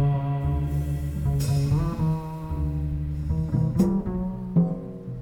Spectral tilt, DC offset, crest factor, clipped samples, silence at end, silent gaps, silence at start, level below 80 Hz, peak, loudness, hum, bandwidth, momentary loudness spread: -8.5 dB/octave; under 0.1%; 16 dB; under 0.1%; 0 s; none; 0 s; -34 dBFS; -10 dBFS; -26 LUFS; none; 17 kHz; 7 LU